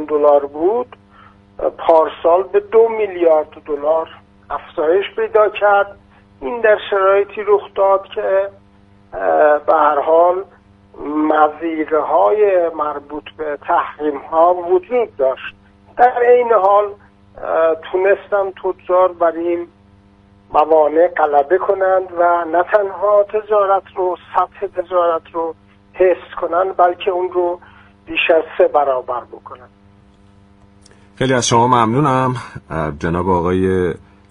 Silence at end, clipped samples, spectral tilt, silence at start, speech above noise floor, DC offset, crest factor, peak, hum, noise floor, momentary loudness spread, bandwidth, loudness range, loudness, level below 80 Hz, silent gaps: 0.35 s; under 0.1%; -5.5 dB/octave; 0 s; 33 dB; under 0.1%; 16 dB; 0 dBFS; none; -48 dBFS; 12 LU; 10.5 kHz; 3 LU; -15 LUFS; -48 dBFS; none